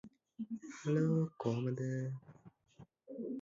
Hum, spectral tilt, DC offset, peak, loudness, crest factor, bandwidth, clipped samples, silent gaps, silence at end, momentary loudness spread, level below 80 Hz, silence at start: none; -9 dB/octave; under 0.1%; -22 dBFS; -38 LUFS; 18 dB; 7.6 kHz; under 0.1%; none; 0 s; 16 LU; -78 dBFS; 0.05 s